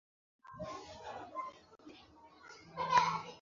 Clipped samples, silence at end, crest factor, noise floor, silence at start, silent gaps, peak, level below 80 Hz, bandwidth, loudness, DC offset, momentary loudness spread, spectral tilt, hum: under 0.1%; 0 s; 24 dB; -60 dBFS; 0.45 s; none; -16 dBFS; -70 dBFS; 7.4 kHz; -37 LUFS; under 0.1%; 27 LU; -1.5 dB/octave; none